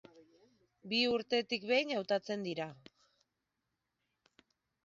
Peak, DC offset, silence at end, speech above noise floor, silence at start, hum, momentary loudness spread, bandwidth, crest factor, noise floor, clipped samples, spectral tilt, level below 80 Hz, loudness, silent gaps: -18 dBFS; under 0.1%; 2.1 s; 52 dB; 0.15 s; none; 9 LU; 7.6 kHz; 22 dB; -86 dBFS; under 0.1%; -1.5 dB/octave; -80 dBFS; -34 LUFS; none